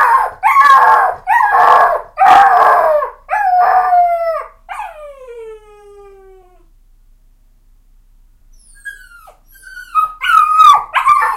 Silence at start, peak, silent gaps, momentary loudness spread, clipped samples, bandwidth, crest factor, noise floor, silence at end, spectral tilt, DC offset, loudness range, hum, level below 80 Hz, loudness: 0 s; 0 dBFS; none; 24 LU; 0.2%; 16.5 kHz; 12 dB; -48 dBFS; 0 s; -1.5 dB/octave; under 0.1%; 17 LU; none; -46 dBFS; -10 LUFS